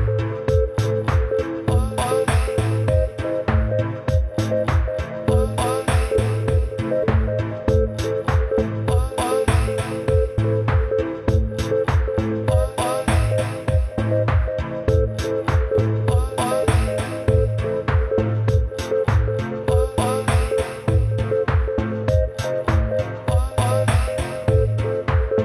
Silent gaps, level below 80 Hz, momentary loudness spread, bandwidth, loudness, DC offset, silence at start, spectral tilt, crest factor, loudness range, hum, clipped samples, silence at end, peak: none; -26 dBFS; 3 LU; 14 kHz; -21 LUFS; under 0.1%; 0 s; -6.5 dB/octave; 16 dB; 1 LU; none; under 0.1%; 0 s; -4 dBFS